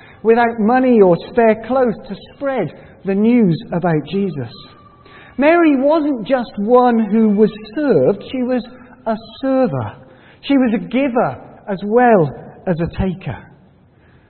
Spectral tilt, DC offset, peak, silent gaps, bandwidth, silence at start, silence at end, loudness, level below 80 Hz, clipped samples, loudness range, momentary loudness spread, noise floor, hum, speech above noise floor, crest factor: -12.5 dB/octave; under 0.1%; 0 dBFS; none; 4.4 kHz; 0.25 s; 0.9 s; -16 LUFS; -44 dBFS; under 0.1%; 4 LU; 16 LU; -49 dBFS; none; 34 dB; 16 dB